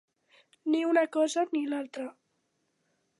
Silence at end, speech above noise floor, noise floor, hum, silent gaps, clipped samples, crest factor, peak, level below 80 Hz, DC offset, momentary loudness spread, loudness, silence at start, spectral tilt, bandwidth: 1.1 s; 48 dB; -77 dBFS; none; none; under 0.1%; 18 dB; -14 dBFS; -88 dBFS; under 0.1%; 14 LU; -29 LUFS; 0.65 s; -2.5 dB/octave; 11.5 kHz